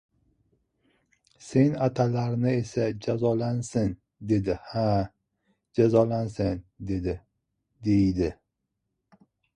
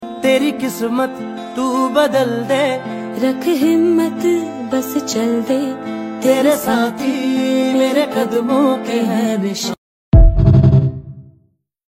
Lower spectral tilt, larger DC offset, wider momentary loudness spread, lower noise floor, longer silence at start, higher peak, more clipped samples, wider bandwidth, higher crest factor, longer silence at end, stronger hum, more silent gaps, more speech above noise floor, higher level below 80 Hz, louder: first, -8 dB/octave vs -6.5 dB/octave; neither; about the same, 11 LU vs 10 LU; first, -81 dBFS vs -58 dBFS; first, 1.4 s vs 0 s; second, -8 dBFS vs 0 dBFS; neither; second, 10.5 kHz vs 16.5 kHz; first, 20 dB vs 14 dB; first, 1.25 s vs 0.75 s; neither; second, none vs 9.78-10.12 s; first, 56 dB vs 42 dB; second, -48 dBFS vs -24 dBFS; second, -26 LUFS vs -16 LUFS